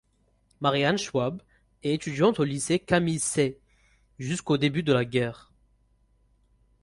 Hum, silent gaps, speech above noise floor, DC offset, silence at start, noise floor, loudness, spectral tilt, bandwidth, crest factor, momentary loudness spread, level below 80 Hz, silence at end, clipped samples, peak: none; none; 41 dB; under 0.1%; 0.6 s; -67 dBFS; -26 LUFS; -5 dB/octave; 11.5 kHz; 20 dB; 9 LU; -58 dBFS; 1.45 s; under 0.1%; -8 dBFS